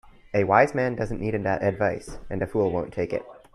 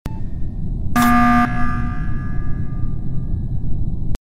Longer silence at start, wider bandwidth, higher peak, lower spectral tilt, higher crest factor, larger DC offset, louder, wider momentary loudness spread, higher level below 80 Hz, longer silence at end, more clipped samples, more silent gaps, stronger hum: about the same, 0.05 s vs 0.05 s; second, 12 kHz vs 16 kHz; about the same, -4 dBFS vs -2 dBFS; about the same, -7.5 dB/octave vs -6.5 dB/octave; first, 22 dB vs 14 dB; neither; second, -25 LUFS vs -21 LUFS; about the same, 12 LU vs 14 LU; second, -46 dBFS vs -24 dBFS; first, 0.2 s vs 0.05 s; neither; neither; neither